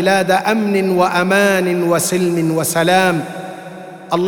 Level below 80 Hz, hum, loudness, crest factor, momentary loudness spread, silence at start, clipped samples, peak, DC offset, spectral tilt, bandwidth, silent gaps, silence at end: -66 dBFS; none; -15 LUFS; 14 dB; 16 LU; 0 s; under 0.1%; 0 dBFS; 0.2%; -4.5 dB/octave; 20 kHz; none; 0 s